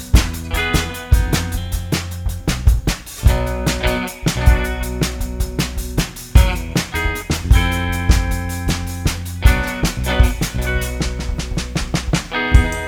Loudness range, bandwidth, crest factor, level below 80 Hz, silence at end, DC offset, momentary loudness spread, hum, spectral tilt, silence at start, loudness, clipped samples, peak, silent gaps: 1 LU; 19 kHz; 16 dB; -20 dBFS; 0 s; under 0.1%; 7 LU; none; -4.5 dB/octave; 0 s; -19 LUFS; under 0.1%; 0 dBFS; none